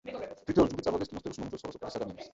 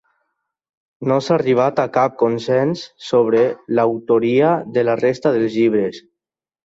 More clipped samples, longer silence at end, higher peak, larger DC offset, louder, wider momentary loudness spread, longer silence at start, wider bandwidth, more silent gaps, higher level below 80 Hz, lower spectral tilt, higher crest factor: neither; second, 0.05 s vs 0.65 s; second, -12 dBFS vs -4 dBFS; neither; second, -33 LUFS vs -17 LUFS; first, 13 LU vs 5 LU; second, 0.05 s vs 1 s; about the same, 8 kHz vs 7.8 kHz; neither; first, -54 dBFS vs -60 dBFS; about the same, -6.5 dB/octave vs -7 dB/octave; first, 22 dB vs 14 dB